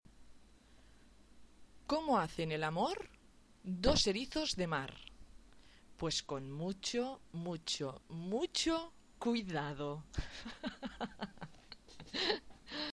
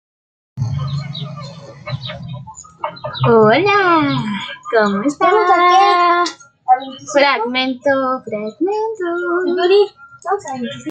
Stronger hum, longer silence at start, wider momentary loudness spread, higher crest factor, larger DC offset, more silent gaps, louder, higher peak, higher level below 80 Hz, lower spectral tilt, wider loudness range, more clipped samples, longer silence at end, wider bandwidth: neither; second, 0.15 s vs 0.55 s; about the same, 17 LU vs 17 LU; first, 24 dB vs 14 dB; neither; neither; second, -38 LUFS vs -15 LUFS; second, -16 dBFS vs -2 dBFS; about the same, -54 dBFS vs -54 dBFS; second, -4 dB/octave vs -5.5 dB/octave; about the same, 6 LU vs 5 LU; neither; about the same, 0 s vs 0 s; first, 11 kHz vs 9 kHz